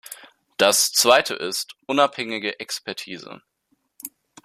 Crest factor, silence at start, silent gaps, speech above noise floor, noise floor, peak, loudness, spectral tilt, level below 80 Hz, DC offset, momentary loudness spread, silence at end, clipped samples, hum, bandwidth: 22 dB; 0.1 s; none; 48 dB; -70 dBFS; -2 dBFS; -20 LUFS; -1 dB/octave; -70 dBFS; under 0.1%; 22 LU; 0.35 s; under 0.1%; none; 15 kHz